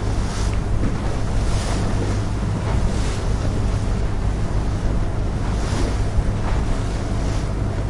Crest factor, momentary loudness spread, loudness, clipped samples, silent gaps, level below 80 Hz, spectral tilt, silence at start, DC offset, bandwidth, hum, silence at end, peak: 12 dB; 2 LU; -23 LUFS; under 0.1%; none; -22 dBFS; -6.5 dB/octave; 0 s; under 0.1%; 11.5 kHz; none; 0 s; -8 dBFS